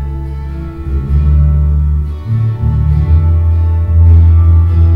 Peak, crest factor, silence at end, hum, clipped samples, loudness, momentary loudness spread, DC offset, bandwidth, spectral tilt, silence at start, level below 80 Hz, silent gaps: 0 dBFS; 8 dB; 0 s; none; under 0.1%; -11 LUFS; 14 LU; under 0.1%; 2.6 kHz; -11 dB/octave; 0 s; -12 dBFS; none